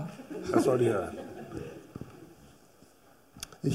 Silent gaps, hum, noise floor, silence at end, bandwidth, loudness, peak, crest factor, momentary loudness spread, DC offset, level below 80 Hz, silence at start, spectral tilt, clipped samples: none; none; -60 dBFS; 0 s; 16 kHz; -31 LUFS; -10 dBFS; 22 dB; 20 LU; under 0.1%; -62 dBFS; 0 s; -6.5 dB/octave; under 0.1%